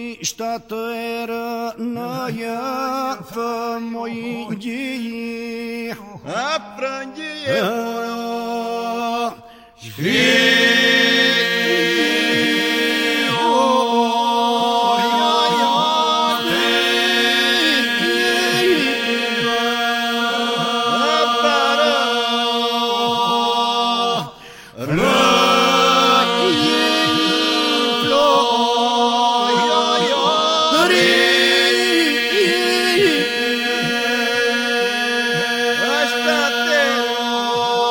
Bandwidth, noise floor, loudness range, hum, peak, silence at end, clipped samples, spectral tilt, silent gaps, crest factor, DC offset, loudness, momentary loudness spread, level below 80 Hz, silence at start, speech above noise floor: 16.5 kHz; -39 dBFS; 10 LU; none; -2 dBFS; 0 s; under 0.1%; -2.5 dB/octave; none; 14 dB; under 0.1%; -16 LUFS; 13 LU; -56 dBFS; 0 s; 17 dB